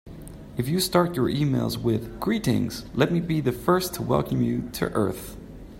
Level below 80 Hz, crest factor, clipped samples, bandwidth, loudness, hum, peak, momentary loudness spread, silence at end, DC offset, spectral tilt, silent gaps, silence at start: -46 dBFS; 20 dB; under 0.1%; 16.5 kHz; -25 LUFS; none; -6 dBFS; 13 LU; 0 s; under 0.1%; -6 dB/octave; none; 0.05 s